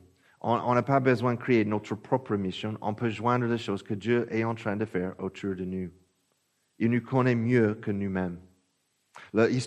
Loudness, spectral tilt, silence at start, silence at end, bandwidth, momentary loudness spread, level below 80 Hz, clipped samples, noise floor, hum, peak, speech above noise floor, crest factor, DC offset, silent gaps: -28 LUFS; -7.5 dB/octave; 0.45 s; 0 s; 9.6 kHz; 10 LU; -68 dBFS; under 0.1%; -74 dBFS; none; -10 dBFS; 47 dB; 20 dB; under 0.1%; none